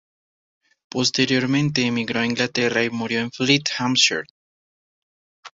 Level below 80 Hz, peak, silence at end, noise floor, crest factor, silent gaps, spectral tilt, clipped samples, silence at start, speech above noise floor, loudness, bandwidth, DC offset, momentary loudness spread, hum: -60 dBFS; -2 dBFS; 0.1 s; under -90 dBFS; 22 dB; 4.30-5.43 s; -3.5 dB/octave; under 0.1%; 0.95 s; over 69 dB; -20 LUFS; 8 kHz; under 0.1%; 7 LU; none